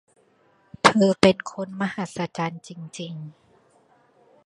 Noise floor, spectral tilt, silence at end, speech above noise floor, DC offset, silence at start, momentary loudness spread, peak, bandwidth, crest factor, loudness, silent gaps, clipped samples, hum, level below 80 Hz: -61 dBFS; -5 dB/octave; 1.15 s; 37 dB; under 0.1%; 0.85 s; 21 LU; 0 dBFS; 11.5 kHz; 24 dB; -22 LUFS; none; under 0.1%; none; -60 dBFS